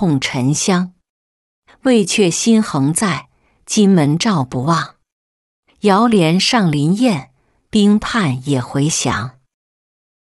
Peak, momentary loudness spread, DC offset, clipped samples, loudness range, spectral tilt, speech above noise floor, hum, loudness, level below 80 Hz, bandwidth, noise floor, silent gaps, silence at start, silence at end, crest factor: -2 dBFS; 7 LU; under 0.1%; under 0.1%; 2 LU; -5 dB/octave; over 76 dB; none; -15 LUFS; -48 dBFS; 12 kHz; under -90 dBFS; 1.09-1.63 s, 5.12-5.63 s; 0 s; 0.9 s; 14 dB